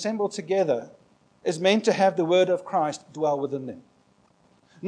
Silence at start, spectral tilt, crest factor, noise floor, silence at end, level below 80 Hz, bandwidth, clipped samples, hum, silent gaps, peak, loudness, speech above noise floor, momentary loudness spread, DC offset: 0 s; -5 dB/octave; 20 dB; -62 dBFS; 0 s; -78 dBFS; 10.5 kHz; under 0.1%; none; none; -6 dBFS; -24 LUFS; 38 dB; 11 LU; under 0.1%